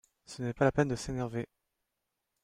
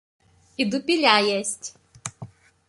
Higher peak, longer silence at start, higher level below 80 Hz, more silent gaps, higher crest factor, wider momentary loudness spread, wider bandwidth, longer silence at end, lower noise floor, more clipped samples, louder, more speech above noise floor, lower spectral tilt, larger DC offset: second, -14 dBFS vs -2 dBFS; second, 0.3 s vs 0.6 s; first, -56 dBFS vs -66 dBFS; neither; about the same, 20 dB vs 24 dB; second, 16 LU vs 20 LU; first, 13.5 kHz vs 11.5 kHz; first, 1 s vs 0.45 s; first, -85 dBFS vs -44 dBFS; neither; second, -33 LUFS vs -21 LUFS; first, 53 dB vs 22 dB; first, -6.5 dB/octave vs -2.5 dB/octave; neither